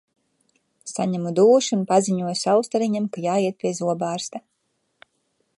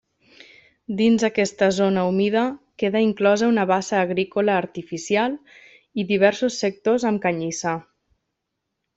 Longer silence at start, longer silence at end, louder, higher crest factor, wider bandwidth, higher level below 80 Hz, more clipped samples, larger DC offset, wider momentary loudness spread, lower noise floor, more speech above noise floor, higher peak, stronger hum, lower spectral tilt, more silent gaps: about the same, 0.85 s vs 0.9 s; about the same, 1.2 s vs 1.15 s; about the same, -21 LUFS vs -21 LUFS; about the same, 18 dB vs 20 dB; first, 11.5 kHz vs 8 kHz; second, -72 dBFS vs -64 dBFS; neither; neither; first, 14 LU vs 9 LU; second, -72 dBFS vs -79 dBFS; second, 51 dB vs 59 dB; about the same, -4 dBFS vs -2 dBFS; neither; about the same, -5 dB/octave vs -5 dB/octave; neither